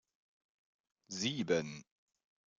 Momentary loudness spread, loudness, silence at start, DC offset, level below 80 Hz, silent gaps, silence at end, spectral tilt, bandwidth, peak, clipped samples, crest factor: 14 LU; -37 LUFS; 1.1 s; under 0.1%; -78 dBFS; none; 0.75 s; -4 dB/octave; 9.4 kHz; -18 dBFS; under 0.1%; 24 dB